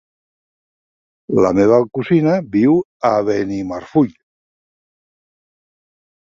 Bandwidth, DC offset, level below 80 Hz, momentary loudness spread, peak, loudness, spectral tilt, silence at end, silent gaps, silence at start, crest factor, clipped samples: 7.4 kHz; under 0.1%; -52 dBFS; 7 LU; -2 dBFS; -16 LUFS; -8 dB/octave; 2.3 s; 2.85-3.00 s; 1.3 s; 16 dB; under 0.1%